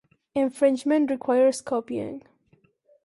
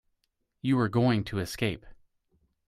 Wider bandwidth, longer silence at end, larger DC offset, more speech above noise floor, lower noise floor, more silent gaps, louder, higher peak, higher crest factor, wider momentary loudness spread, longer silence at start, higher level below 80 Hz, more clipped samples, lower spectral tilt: second, 11.5 kHz vs 15 kHz; about the same, 0.85 s vs 0.75 s; neither; second, 41 dB vs 50 dB; second, -64 dBFS vs -77 dBFS; neither; first, -24 LUFS vs -28 LUFS; first, -8 dBFS vs -12 dBFS; about the same, 16 dB vs 18 dB; about the same, 11 LU vs 10 LU; second, 0.35 s vs 0.65 s; second, -70 dBFS vs -56 dBFS; neither; second, -5 dB/octave vs -6.5 dB/octave